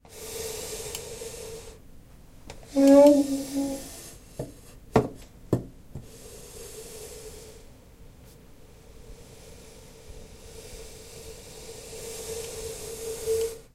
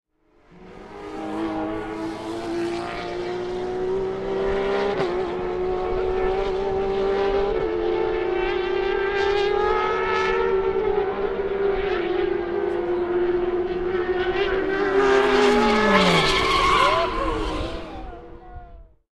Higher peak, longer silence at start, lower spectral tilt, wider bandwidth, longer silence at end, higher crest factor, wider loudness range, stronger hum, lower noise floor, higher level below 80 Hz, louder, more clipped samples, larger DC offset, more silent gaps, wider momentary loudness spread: about the same, -4 dBFS vs -2 dBFS; second, 0.1 s vs 0.55 s; about the same, -5.5 dB/octave vs -5 dB/octave; first, 16 kHz vs 12 kHz; second, 0.1 s vs 0.3 s; about the same, 24 dB vs 20 dB; first, 23 LU vs 8 LU; neither; second, -50 dBFS vs -57 dBFS; second, -50 dBFS vs -38 dBFS; second, -26 LUFS vs -22 LUFS; neither; neither; neither; first, 24 LU vs 12 LU